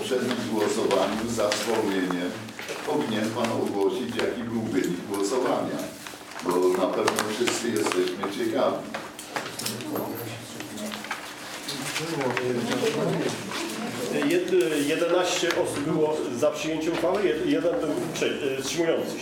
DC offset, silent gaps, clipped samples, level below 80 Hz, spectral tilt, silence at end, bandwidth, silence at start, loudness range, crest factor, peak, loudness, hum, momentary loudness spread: under 0.1%; none; under 0.1%; -62 dBFS; -4 dB/octave; 0 s; 18 kHz; 0 s; 6 LU; 22 dB; -4 dBFS; -27 LUFS; none; 10 LU